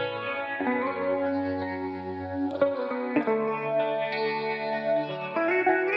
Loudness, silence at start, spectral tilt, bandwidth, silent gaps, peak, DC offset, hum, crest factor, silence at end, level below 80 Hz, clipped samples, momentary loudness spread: -28 LUFS; 0 s; -8 dB/octave; 6 kHz; none; -10 dBFS; under 0.1%; none; 18 dB; 0 s; -72 dBFS; under 0.1%; 6 LU